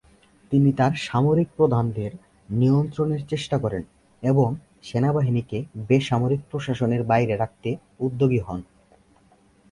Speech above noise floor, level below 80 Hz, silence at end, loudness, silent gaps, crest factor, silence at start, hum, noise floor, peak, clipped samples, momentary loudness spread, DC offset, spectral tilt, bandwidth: 36 dB; -52 dBFS; 1.1 s; -23 LUFS; none; 18 dB; 0.5 s; none; -58 dBFS; -6 dBFS; under 0.1%; 11 LU; under 0.1%; -8 dB/octave; 11 kHz